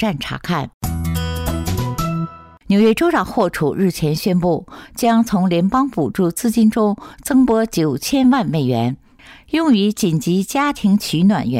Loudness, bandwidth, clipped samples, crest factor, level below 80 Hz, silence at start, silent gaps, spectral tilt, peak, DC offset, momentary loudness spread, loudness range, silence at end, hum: -17 LUFS; 16 kHz; under 0.1%; 12 dB; -40 dBFS; 0 s; 0.74-0.81 s; -6 dB/octave; -6 dBFS; under 0.1%; 8 LU; 2 LU; 0 s; none